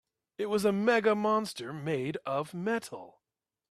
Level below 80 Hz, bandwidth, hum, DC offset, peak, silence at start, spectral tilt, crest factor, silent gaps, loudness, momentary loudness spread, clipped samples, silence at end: -74 dBFS; 14 kHz; none; under 0.1%; -14 dBFS; 0.4 s; -5.5 dB/octave; 18 dB; none; -30 LUFS; 12 LU; under 0.1%; 0.6 s